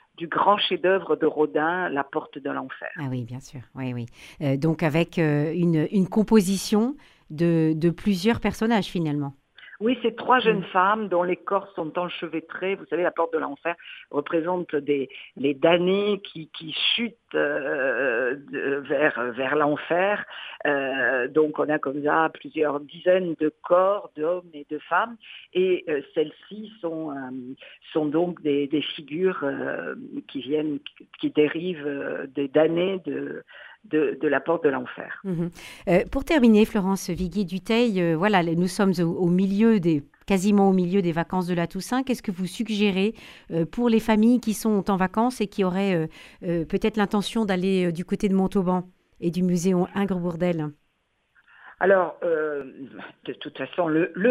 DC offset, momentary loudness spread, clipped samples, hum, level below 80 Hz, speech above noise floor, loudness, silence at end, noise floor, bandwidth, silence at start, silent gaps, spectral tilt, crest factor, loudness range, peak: under 0.1%; 12 LU; under 0.1%; none; -52 dBFS; 47 dB; -24 LUFS; 0 s; -71 dBFS; 14.5 kHz; 0.2 s; none; -6 dB/octave; 20 dB; 5 LU; -4 dBFS